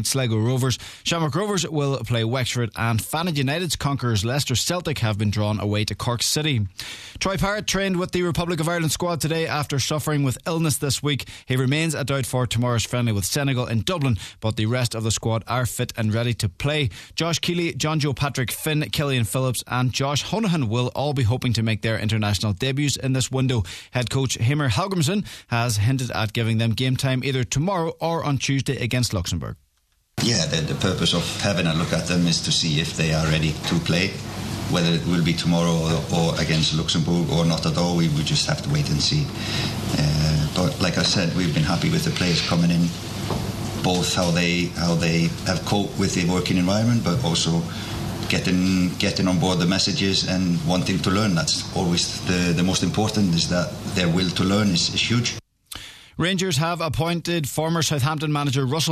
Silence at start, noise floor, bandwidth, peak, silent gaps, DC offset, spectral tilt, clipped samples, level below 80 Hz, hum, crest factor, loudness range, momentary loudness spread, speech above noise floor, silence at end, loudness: 0 s; -66 dBFS; 14 kHz; -4 dBFS; none; under 0.1%; -4.5 dB/octave; under 0.1%; -44 dBFS; none; 18 dB; 3 LU; 5 LU; 44 dB; 0 s; -22 LUFS